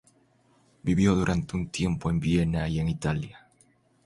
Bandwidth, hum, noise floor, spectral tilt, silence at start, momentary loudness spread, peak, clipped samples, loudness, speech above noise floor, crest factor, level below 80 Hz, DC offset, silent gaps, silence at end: 11.5 kHz; none; -64 dBFS; -6.5 dB/octave; 0.85 s; 9 LU; -10 dBFS; under 0.1%; -27 LUFS; 38 dB; 18 dB; -42 dBFS; under 0.1%; none; 0.65 s